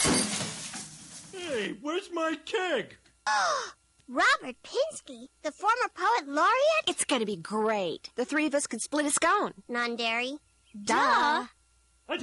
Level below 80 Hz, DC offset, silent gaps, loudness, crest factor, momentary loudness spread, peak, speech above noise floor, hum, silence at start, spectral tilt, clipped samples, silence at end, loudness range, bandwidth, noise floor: -62 dBFS; under 0.1%; none; -28 LUFS; 14 dB; 14 LU; -14 dBFS; 37 dB; none; 0 s; -2 dB/octave; under 0.1%; 0 s; 4 LU; 11.5 kHz; -66 dBFS